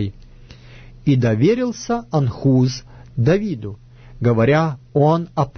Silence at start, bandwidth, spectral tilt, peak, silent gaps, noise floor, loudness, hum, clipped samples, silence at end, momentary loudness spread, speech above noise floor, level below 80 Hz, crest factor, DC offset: 0 s; 6.6 kHz; -7.5 dB/octave; -4 dBFS; none; -41 dBFS; -18 LUFS; none; under 0.1%; 0 s; 12 LU; 24 dB; -44 dBFS; 14 dB; under 0.1%